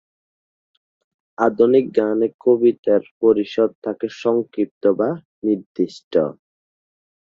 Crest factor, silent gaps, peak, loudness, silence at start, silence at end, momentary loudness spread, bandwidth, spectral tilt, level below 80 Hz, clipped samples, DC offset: 18 dB; 2.34-2.39 s, 2.78-2.83 s, 3.11-3.21 s, 3.75-3.82 s, 4.71-4.81 s, 5.25-5.42 s, 5.66-5.75 s, 6.04-6.11 s; -2 dBFS; -19 LUFS; 1.4 s; 0.9 s; 9 LU; 7.2 kHz; -7.5 dB/octave; -64 dBFS; under 0.1%; under 0.1%